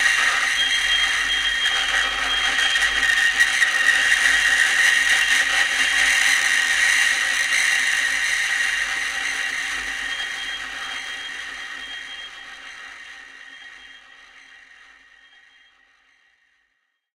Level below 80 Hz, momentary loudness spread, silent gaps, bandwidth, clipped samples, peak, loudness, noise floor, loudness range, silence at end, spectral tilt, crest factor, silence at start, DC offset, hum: -52 dBFS; 19 LU; none; 16.5 kHz; under 0.1%; -4 dBFS; -18 LUFS; -72 dBFS; 17 LU; 3.15 s; 2 dB/octave; 18 dB; 0 s; under 0.1%; none